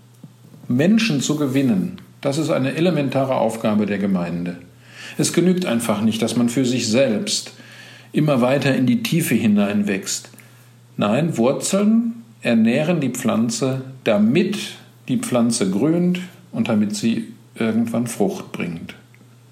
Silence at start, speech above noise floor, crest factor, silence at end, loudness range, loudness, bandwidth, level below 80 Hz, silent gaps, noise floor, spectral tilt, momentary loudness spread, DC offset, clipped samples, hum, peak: 0.25 s; 29 dB; 16 dB; 0.6 s; 2 LU; -20 LUFS; 16 kHz; -66 dBFS; none; -48 dBFS; -5.5 dB/octave; 11 LU; under 0.1%; under 0.1%; none; -4 dBFS